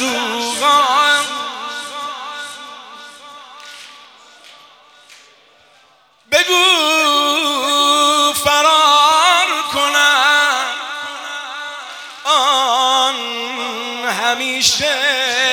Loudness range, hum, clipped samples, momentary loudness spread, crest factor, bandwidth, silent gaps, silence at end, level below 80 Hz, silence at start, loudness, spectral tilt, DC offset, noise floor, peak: 16 LU; none; under 0.1%; 19 LU; 16 dB; 18 kHz; none; 0 s; -60 dBFS; 0 s; -13 LUFS; 0 dB/octave; under 0.1%; -52 dBFS; 0 dBFS